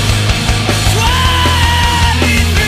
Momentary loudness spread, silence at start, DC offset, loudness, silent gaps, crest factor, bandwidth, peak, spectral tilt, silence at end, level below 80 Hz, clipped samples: 2 LU; 0 s; under 0.1%; -11 LUFS; none; 10 dB; 16 kHz; 0 dBFS; -4 dB/octave; 0 s; -18 dBFS; under 0.1%